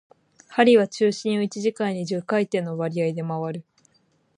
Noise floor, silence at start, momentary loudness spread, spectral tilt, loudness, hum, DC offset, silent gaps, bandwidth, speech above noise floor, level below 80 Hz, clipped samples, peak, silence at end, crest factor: -65 dBFS; 0.5 s; 12 LU; -6 dB/octave; -23 LUFS; none; under 0.1%; none; 10.5 kHz; 43 dB; -74 dBFS; under 0.1%; -4 dBFS; 0.75 s; 20 dB